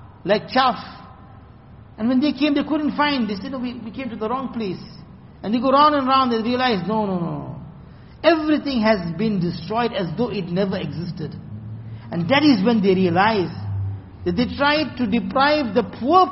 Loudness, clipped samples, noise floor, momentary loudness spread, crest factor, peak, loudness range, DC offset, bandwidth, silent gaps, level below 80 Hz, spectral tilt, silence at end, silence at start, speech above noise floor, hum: -20 LUFS; under 0.1%; -44 dBFS; 15 LU; 18 dB; -2 dBFS; 4 LU; under 0.1%; 6 kHz; none; -48 dBFS; -4 dB/octave; 0 s; 0 s; 24 dB; none